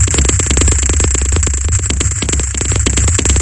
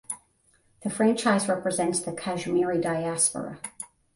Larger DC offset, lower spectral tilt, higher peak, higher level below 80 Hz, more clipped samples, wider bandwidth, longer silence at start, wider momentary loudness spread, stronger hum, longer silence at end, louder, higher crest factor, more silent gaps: neither; about the same, -3.5 dB/octave vs -4 dB/octave; first, 0 dBFS vs -10 dBFS; first, -16 dBFS vs -64 dBFS; neither; about the same, 11.5 kHz vs 11.5 kHz; about the same, 0 s vs 0.1 s; second, 4 LU vs 14 LU; neither; second, 0 s vs 0.3 s; first, -13 LUFS vs -26 LUFS; second, 12 dB vs 18 dB; neither